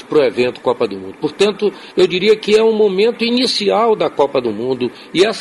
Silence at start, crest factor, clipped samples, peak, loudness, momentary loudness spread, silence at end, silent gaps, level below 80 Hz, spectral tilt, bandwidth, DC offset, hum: 0.1 s; 14 dB; under 0.1%; -2 dBFS; -15 LUFS; 8 LU; 0 s; none; -56 dBFS; -4.5 dB/octave; 11.5 kHz; under 0.1%; none